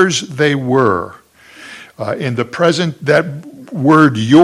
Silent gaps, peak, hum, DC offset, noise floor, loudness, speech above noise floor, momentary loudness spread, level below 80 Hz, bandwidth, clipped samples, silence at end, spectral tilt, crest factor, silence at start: none; 0 dBFS; none; under 0.1%; -38 dBFS; -14 LUFS; 25 dB; 20 LU; -56 dBFS; 12 kHz; 0.3%; 0 s; -5.5 dB/octave; 14 dB; 0 s